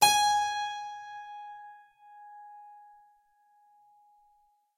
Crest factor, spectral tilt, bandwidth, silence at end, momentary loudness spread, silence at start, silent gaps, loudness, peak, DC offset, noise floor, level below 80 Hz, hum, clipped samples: 24 dB; 1 dB/octave; 15.5 kHz; 2.05 s; 26 LU; 0 s; none; -29 LUFS; -8 dBFS; under 0.1%; -68 dBFS; -72 dBFS; none; under 0.1%